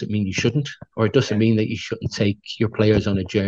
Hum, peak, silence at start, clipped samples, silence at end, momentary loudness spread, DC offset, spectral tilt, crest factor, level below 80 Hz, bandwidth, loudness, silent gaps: none; -4 dBFS; 0 s; under 0.1%; 0 s; 8 LU; under 0.1%; -6.5 dB/octave; 16 dB; -46 dBFS; 7.8 kHz; -21 LUFS; none